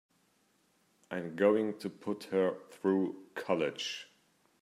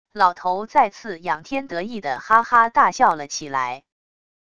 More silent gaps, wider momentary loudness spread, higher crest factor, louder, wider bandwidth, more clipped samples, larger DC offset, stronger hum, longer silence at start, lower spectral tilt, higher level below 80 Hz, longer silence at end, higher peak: neither; about the same, 12 LU vs 12 LU; about the same, 20 dB vs 20 dB; second, -34 LUFS vs -20 LUFS; first, 14 kHz vs 10 kHz; neither; second, under 0.1% vs 0.4%; neither; first, 1.1 s vs 0.15 s; first, -5.5 dB/octave vs -3 dB/octave; second, -84 dBFS vs -60 dBFS; second, 0.6 s vs 0.8 s; second, -14 dBFS vs 0 dBFS